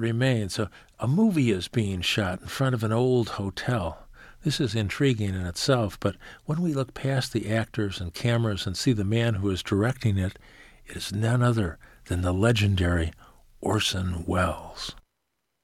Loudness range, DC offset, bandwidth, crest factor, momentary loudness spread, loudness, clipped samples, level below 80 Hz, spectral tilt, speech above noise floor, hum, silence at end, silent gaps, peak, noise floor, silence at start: 2 LU; under 0.1%; 15 kHz; 18 dB; 10 LU; -26 LUFS; under 0.1%; -46 dBFS; -6 dB/octave; 54 dB; none; 0.65 s; none; -8 dBFS; -79 dBFS; 0 s